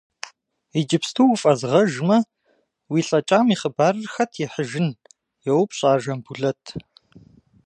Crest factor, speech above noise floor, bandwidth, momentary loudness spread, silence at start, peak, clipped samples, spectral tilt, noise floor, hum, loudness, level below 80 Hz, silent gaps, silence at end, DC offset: 18 dB; 46 dB; 11.5 kHz; 15 LU; 0.75 s; -4 dBFS; under 0.1%; -5.5 dB/octave; -66 dBFS; none; -21 LUFS; -64 dBFS; none; 0.85 s; under 0.1%